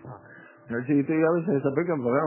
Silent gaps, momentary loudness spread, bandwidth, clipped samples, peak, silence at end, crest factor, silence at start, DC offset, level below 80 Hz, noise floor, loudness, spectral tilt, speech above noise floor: none; 15 LU; 3.1 kHz; under 0.1%; -10 dBFS; 0 s; 16 dB; 0.05 s; under 0.1%; -68 dBFS; -50 dBFS; -25 LUFS; -13 dB/octave; 26 dB